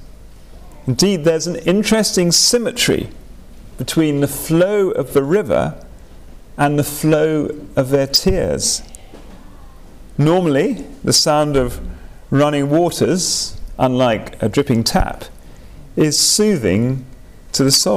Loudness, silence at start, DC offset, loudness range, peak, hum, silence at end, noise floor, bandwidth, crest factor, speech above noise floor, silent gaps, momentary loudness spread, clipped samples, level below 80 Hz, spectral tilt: -16 LUFS; 0 s; 0.6%; 3 LU; -4 dBFS; none; 0 s; -38 dBFS; 16 kHz; 12 dB; 23 dB; none; 11 LU; under 0.1%; -34 dBFS; -4 dB/octave